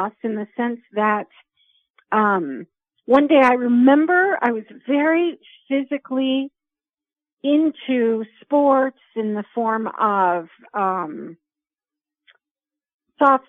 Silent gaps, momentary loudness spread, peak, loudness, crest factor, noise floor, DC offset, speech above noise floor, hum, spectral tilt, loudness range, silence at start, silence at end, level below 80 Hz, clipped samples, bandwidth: 1.90-1.94 s, 7.33-7.37 s, 12.51-12.55 s, 12.94-12.99 s; 13 LU; -2 dBFS; -19 LUFS; 18 dB; under -90 dBFS; under 0.1%; over 71 dB; none; -7 dB/octave; 7 LU; 0 s; 0.1 s; -72 dBFS; under 0.1%; 6 kHz